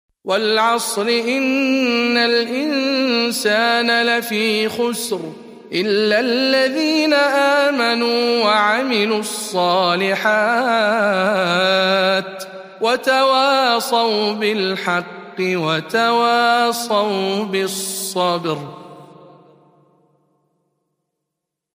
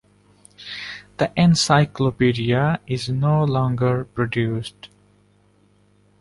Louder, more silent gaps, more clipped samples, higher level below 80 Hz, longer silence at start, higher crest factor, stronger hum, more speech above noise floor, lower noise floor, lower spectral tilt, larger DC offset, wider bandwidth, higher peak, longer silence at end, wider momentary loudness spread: first, -17 LUFS vs -20 LUFS; neither; neither; second, -72 dBFS vs -50 dBFS; second, 0.25 s vs 0.6 s; about the same, 16 dB vs 18 dB; second, none vs 50 Hz at -35 dBFS; first, 64 dB vs 39 dB; first, -81 dBFS vs -58 dBFS; second, -3.5 dB/octave vs -6 dB/octave; neither; first, 15.5 kHz vs 11.5 kHz; about the same, -2 dBFS vs -4 dBFS; first, 2.6 s vs 1.35 s; second, 7 LU vs 15 LU